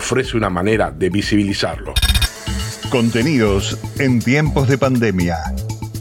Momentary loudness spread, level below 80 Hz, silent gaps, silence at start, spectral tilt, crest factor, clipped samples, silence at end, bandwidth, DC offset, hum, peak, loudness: 8 LU; -28 dBFS; none; 0 s; -5.5 dB/octave; 14 dB; under 0.1%; 0 s; 17 kHz; under 0.1%; none; -2 dBFS; -17 LUFS